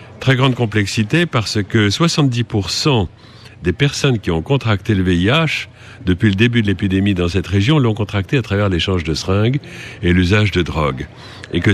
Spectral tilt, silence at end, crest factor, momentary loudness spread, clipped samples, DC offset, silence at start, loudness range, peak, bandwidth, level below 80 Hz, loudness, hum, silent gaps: -6 dB/octave; 0 s; 14 dB; 8 LU; under 0.1%; under 0.1%; 0 s; 1 LU; -2 dBFS; 13.5 kHz; -40 dBFS; -16 LUFS; none; none